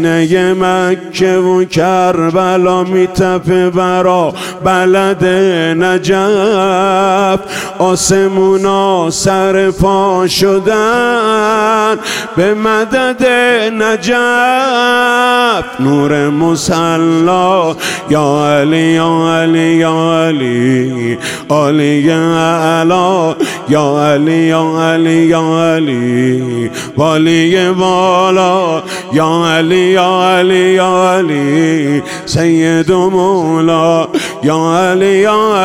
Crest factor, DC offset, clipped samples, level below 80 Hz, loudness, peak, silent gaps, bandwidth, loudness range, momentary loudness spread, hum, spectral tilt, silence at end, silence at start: 10 dB; 0.3%; under 0.1%; -42 dBFS; -10 LUFS; 0 dBFS; none; 16 kHz; 1 LU; 4 LU; none; -5 dB/octave; 0 s; 0 s